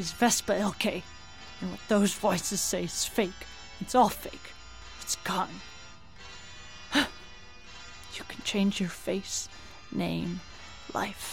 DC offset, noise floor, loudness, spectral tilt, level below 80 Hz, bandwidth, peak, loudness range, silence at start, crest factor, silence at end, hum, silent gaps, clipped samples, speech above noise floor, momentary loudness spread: 0.3%; -50 dBFS; -30 LUFS; -3.5 dB/octave; -54 dBFS; 16.5 kHz; -10 dBFS; 6 LU; 0 s; 22 dB; 0 s; none; none; under 0.1%; 20 dB; 21 LU